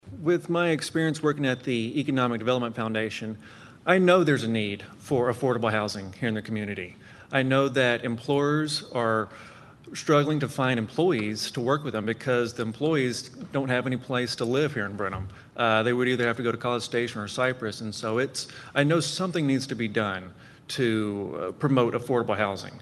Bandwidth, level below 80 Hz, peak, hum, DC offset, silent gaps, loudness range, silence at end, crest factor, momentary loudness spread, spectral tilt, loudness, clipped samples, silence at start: 12.5 kHz; -62 dBFS; -4 dBFS; none; under 0.1%; none; 2 LU; 0 s; 22 dB; 9 LU; -5.5 dB/octave; -26 LUFS; under 0.1%; 0.05 s